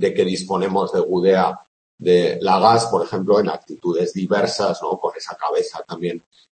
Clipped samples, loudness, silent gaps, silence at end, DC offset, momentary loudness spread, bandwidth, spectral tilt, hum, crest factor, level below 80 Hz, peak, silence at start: under 0.1%; -19 LUFS; 1.68-1.98 s; 0.4 s; under 0.1%; 11 LU; 8.8 kHz; -5.5 dB/octave; none; 18 dB; -64 dBFS; -2 dBFS; 0 s